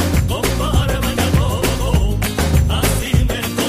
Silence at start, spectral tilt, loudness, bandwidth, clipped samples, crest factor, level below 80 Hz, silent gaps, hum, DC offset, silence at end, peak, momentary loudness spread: 0 s; -5 dB/octave; -17 LUFS; 15.5 kHz; under 0.1%; 14 dB; -20 dBFS; none; none; under 0.1%; 0 s; -2 dBFS; 2 LU